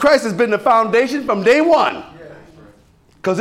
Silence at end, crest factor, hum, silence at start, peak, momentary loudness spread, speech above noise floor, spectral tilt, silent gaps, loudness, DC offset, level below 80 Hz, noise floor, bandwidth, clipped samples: 0 s; 12 dB; none; 0 s; -4 dBFS; 9 LU; 37 dB; -5 dB/octave; none; -15 LUFS; under 0.1%; -54 dBFS; -51 dBFS; 15 kHz; under 0.1%